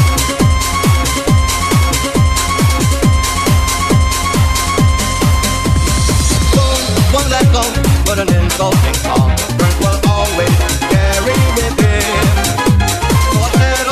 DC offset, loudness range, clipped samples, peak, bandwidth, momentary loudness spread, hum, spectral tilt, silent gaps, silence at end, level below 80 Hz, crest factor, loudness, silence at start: 0.3%; 1 LU; under 0.1%; 0 dBFS; 14 kHz; 1 LU; none; -4.5 dB/octave; none; 0 s; -18 dBFS; 12 dB; -12 LUFS; 0 s